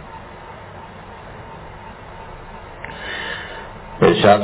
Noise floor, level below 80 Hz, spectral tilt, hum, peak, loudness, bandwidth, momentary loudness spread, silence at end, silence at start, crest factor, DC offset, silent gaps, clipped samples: -37 dBFS; -44 dBFS; -10 dB/octave; none; 0 dBFS; -19 LUFS; 4 kHz; 21 LU; 0 s; 0 s; 22 dB; under 0.1%; none; under 0.1%